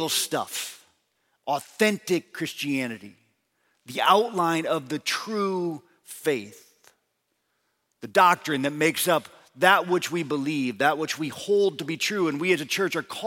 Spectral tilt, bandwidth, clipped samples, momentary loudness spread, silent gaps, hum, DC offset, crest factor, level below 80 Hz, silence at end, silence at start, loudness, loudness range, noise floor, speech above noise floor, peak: -3.5 dB/octave; 17 kHz; under 0.1%; 13 LU; none; none; under 0.1%; 22 dB; -78 dBFS; 0 s; 0 s; -25 LUFS; 6 LU; -75 dBFS; 51 dB; -4 dBFS